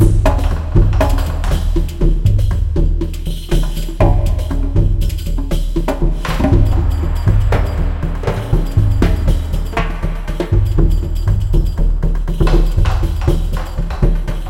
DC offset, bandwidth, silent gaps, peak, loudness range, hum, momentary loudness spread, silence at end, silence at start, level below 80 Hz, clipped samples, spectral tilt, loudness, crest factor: under 0.1%; 13 kHz; none; 0 dBFS; 2 LU; none; 6 LU; 0 s; 0 s; -16 dBFS; under 0.1%; -7.5 dB/octave; -17 LUFS; 14 dB